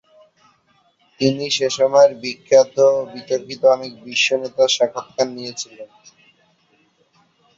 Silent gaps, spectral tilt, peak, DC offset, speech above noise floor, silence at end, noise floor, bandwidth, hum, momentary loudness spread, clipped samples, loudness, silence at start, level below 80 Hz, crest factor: none; -3 dB/octave; -2 dBFS; under 0.1%; 42 dB; 1.7 s; -60 dBFS; 7.8 kHz; none; 12 LU; under 0.1%; -18 LUFS; 1.2 s; -64 dBFS; 18 dB